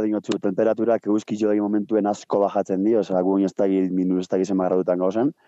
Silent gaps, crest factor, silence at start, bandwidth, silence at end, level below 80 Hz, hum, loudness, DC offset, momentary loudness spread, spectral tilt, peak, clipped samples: none; 14 dB; 0 s; 8.2 kHz; 0.15 s; -80 dBFS; none; -22 LUFS; under 0.1%; 2 LU; -7.5 dB/octave; -8 dBFS; under 0.1%